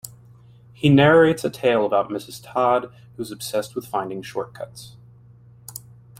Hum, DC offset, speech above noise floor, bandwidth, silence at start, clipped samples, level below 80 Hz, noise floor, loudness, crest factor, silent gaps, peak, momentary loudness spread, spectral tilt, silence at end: none; under 0.1%; 28 dB; 16 kHz; 0.05 s; under 0.1%; -56 dBFS; -48 dBFS; -20 LUFS; 20 dB; none; -2 dBFS; 23 LU; -6 dB/octave; 0.45 s